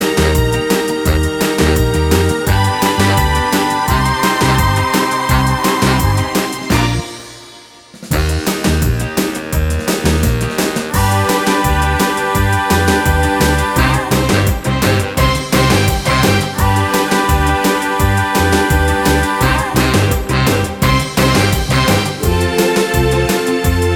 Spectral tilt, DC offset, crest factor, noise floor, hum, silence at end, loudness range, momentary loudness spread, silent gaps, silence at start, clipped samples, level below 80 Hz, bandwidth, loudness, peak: -5 dB/octave; under 0.1%; 14 dB; -38 dBFS; none; 0 s; 3 LU; 4 LU; none; 0 s; under 0.1%; -22 dBFS; over 20 kHz; -14 LUFS; 0 dBFS